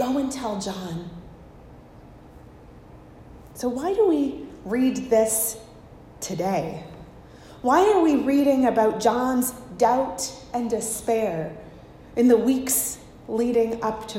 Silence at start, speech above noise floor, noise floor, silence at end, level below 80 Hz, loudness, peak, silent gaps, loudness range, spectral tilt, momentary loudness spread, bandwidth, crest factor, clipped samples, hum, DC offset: 0 s; 24 dB; -46 dBFS; 0 s; -52 dBFS; -23 LUFS; -6 dBFS; none; 9 LU; -4.5 dB/octave; 16 LU; 16 kHz; 18 dB; under 0.1%; none; under 0.1%